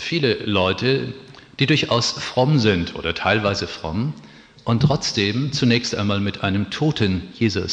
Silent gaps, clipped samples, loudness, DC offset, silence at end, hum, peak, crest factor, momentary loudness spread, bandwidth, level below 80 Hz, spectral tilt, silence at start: none; under 0.1%; -20 LUFS; under 0.1%; 0 s; none; -4 dBFS; 18 dB; 8 LU; 9.4 kHz; -48 dBFS; -5.5 dB/octave; 0 s